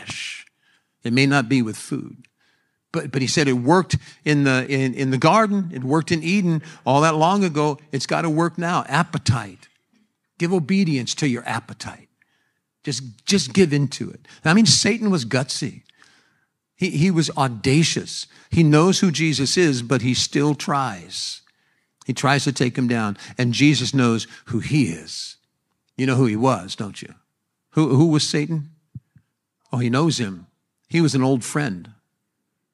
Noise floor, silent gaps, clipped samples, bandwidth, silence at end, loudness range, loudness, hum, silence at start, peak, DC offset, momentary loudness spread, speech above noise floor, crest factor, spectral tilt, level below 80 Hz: -76 dBFS; none; under 0.1%; 12.5 kHz; 0.8 s; 5 LU; -20 LUFS; none; 0 s; 0 dBFS; under 0.1%; 14 LU; 56 dB; 20 dB; -5 dB/octave; -56 dBFS